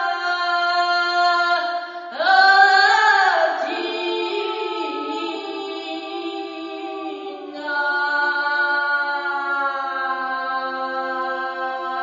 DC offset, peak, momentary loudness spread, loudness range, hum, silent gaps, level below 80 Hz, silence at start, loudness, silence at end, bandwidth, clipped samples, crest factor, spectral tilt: under 0.1%; -2 dBFS; 16 LU; 11 LU; none; none; -82 dBFS; 0 s; -20 LUFS; 0 s; 7.6 kHz; under 0.1%; 18 dB; -0.5 dB/octave